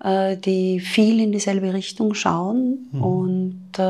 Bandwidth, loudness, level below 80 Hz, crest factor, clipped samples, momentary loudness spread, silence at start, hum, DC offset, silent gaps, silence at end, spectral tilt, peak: 12.5 kHz; -21 LUFS; -66 dBFS; 16 dB; under 0.1%; 7 LU; 0.05 s; none; under 0.1%; none; 0 s; -6 dB/octave; -4 dBFS